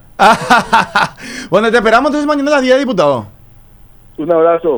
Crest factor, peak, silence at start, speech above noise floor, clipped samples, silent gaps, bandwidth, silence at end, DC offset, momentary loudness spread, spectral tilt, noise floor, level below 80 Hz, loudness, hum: 12 dB; 0 dBFS; 0.2 s; 29 dB; under 0.1%; none; over 20 kHz; 0 s; under 0.1%; 7 LU; -4.5 dB/octave; -40 dBFS; -42 dBFS; -11 LUFS; none